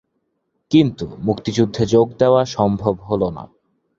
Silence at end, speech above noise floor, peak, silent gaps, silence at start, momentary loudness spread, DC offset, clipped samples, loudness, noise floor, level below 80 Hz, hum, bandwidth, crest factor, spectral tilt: 0.55 s; 54 dB; -2 dBFS; none; 0.7 s; 8 LU; under 0.1%; under 0.1%; -18 LUFS; -71 dBFS; -46 dBFS; none; 7.8 kHz; 18 dB; -7 dB/octave